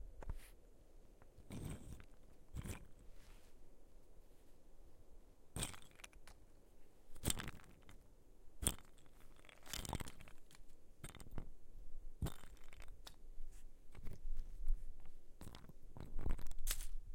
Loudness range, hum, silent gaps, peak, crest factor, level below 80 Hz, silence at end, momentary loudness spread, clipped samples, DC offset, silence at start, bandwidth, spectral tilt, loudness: 8 LU; none; none; -14 dBFS; 30 dB; -50 dBFS; 0 s; 23 LU; under 0.1%; under 0.1%; 0 s; 16.5 kHz; -3 dB/octave; -50 LUFS